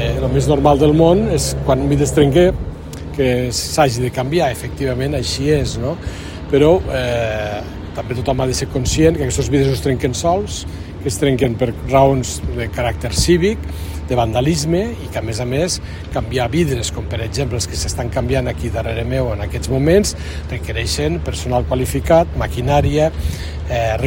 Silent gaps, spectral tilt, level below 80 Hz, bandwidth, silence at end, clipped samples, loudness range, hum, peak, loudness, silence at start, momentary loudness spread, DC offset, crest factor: none; -5.5 dB/octave; -28 dBFS; 16.5 kHz; 0 s; under 0.1%; 4 LU; none; 0 dBFS; -17 LUFS; 0 s; 11 LU; under 0.1%; 16 dB